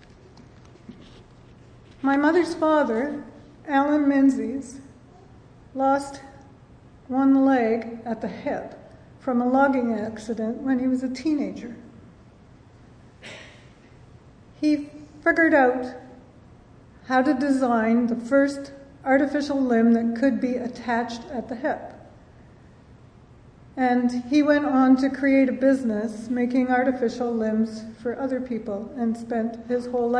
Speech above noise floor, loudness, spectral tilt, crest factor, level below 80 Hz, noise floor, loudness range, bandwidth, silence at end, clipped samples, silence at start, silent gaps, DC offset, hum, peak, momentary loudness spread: 28 dB; -23 LUFS; -6 dB/octave; 18 dB; -58 dBFS; -50 dBFS; 8 LU; 10 kHz; 0 s; under 0.1%; 0.35 s; none; under 0.1%; none; -6 dBFS; 17 LU